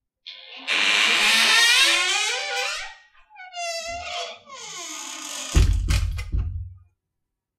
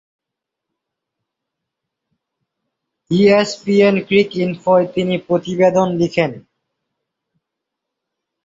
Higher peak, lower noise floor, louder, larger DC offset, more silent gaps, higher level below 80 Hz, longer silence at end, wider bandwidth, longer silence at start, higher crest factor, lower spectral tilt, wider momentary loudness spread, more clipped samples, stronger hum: second, -6 dBFS vs -2 dBFS; about the same, -81 dBFS vs -82 dBFS; second, -20 LUFS vs -15 LUFS; neither; neither; first, -30 dBFS vs -58 dBFS; second, 0.8 s vs 2.05 s; first, 16 kHz vs 7.8 kHz; second, 0.25 s vs 3.1 s; about the same, 18 dB vs 18 dB; second, -1.5 dB/octave vs -6.5 dB/octave; first, 23 LU vs 7 LU; neither; neither